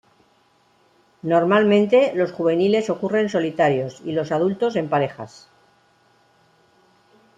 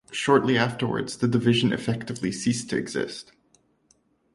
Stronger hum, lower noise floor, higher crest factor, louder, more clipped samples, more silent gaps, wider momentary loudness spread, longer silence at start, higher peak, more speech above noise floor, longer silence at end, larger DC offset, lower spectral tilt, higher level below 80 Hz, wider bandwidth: neither; second, -60 dBFS vs -65 dBFS; about the same, 18 dB vs 20 dB; first, -20 LUFS vs -25 LUFS; neither; neither; about the same, 10 LU vs 9 LU; first, 1.25 s vs 0.1 s; about the same, -4 dBFS vs -6 dBFS; about the same, 41 dB vs 41 dB; first, 2.1 s vs 1.1 s; neither; first, -6.5 dB/octave vs -5 dB/octave; second, -66 dBFS vs -60 dBFS; second, 9 kHz vs 11.5 kHz